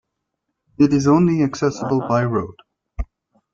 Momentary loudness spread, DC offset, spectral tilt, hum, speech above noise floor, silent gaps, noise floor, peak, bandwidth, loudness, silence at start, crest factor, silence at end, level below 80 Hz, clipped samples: 19 LU; under 0.1%; -7.5 dB/octave; none; 60 dB; none; -77 dBFS; -4 dBFS; 7.4 kHz; -18 LUFS; 0.8 s; 16 dB; 0.5 s; -40 dBFS; under 0.1%